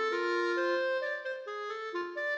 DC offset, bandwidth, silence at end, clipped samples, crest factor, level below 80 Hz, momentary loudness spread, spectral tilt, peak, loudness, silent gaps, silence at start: under 0.1%; 8.2 kHz; 0 s; under 0.1%; 12 dB; -88 dBFS; 8 LU; -2 dB/octave; -20 dBFS; -33 LUFS; none; 0 s